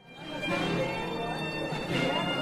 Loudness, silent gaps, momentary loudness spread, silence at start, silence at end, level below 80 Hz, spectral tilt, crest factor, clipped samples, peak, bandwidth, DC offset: -31 LUFS; none; 5 LU; 0 s; 0 s; -54 dBFS; -5 dB/octave; 16 dB; under 0.1%; -16 dBFS; 15 kHz; under 0.1%